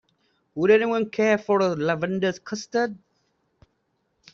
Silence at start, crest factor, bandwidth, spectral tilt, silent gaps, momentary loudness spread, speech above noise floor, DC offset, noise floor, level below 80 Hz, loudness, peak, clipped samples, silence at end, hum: 0.55 s; 18 dB; 7.4 kHz; -4.5 dB/octave; none; 9 LU; 50 dB; under 0.1%; -72 dBFS; -66 dBFS; -23 LUFS; -6 dBFS; under 0.1%; 1.35 s; none